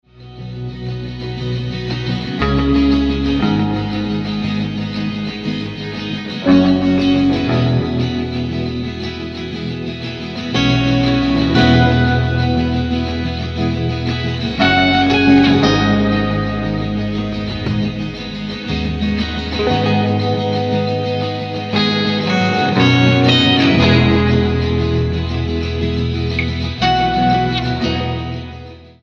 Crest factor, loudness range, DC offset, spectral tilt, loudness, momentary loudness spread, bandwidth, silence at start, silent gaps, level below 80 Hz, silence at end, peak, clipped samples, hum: 16 dB; 6 LU; under 0.1%; -7 dB/octave; -16 LUFS; 13 LU; 7.4 kHz; 0.2 s; none; -30 dBFS; 0.15 s; 0 dBFS; under 0.1%; none